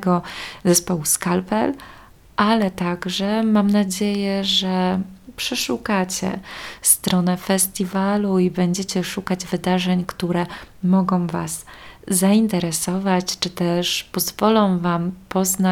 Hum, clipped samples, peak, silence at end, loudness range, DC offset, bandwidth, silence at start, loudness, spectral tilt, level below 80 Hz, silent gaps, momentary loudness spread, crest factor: none; under 0.1%; -2 dBFS; 0 s; 2 LU; under 0.1%; 17 kHz; 0 s; -20 LUFS; -4.5 dB/octave; -50 dBFS; none; 9 LU; 18 dB